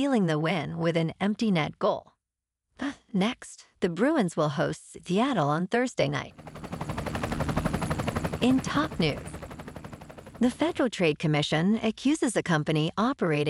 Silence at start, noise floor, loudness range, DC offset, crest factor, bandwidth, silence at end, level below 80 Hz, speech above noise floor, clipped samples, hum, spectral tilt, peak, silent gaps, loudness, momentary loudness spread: 0 s; -88 dBFS; 3 LU; under 0.1%; 16 dB; 15 kHz; 0 s; -48 dBFS; 61 dB; under 0.1%; none; -6 dB/octave; -10 dBFS; none; -27 LUFS; 15 LU